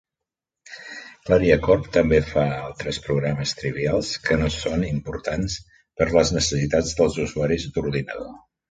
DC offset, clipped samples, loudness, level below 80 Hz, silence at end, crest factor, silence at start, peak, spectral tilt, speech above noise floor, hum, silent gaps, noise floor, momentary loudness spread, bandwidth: under 0.1%; under 0.1%; -22 LUFS; -38 dBFS; 0.3 s; 20 dB; 0.7 s; -4 dBFS; -5 dB/octave; 65 dB; none; none; -86 dBFS; 16 LU; 9.2 kHz